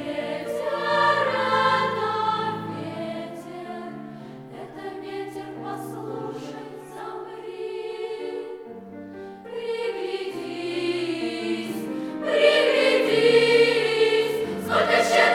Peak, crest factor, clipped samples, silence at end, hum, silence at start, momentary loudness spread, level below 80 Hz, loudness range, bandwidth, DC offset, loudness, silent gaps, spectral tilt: -6 dBFS; 18 dB; under 0.1%; 0 s; none; 0 s; 19 LU; -68 dBFS; 15 LU; 15.5 kHz; under 0.1%; -23 LUFS; none; -4 dB/octave